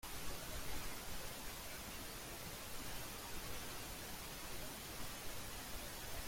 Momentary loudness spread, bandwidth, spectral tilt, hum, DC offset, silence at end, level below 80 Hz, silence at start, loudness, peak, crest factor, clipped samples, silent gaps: 1 LU; 16.5 kHz; -2.5 dB/octave; none; under 0.1%; 0 s; -56 dBFS; 0.05 s; -48 LUFS; -32 dBFS; 16 dB; under 0.1%; none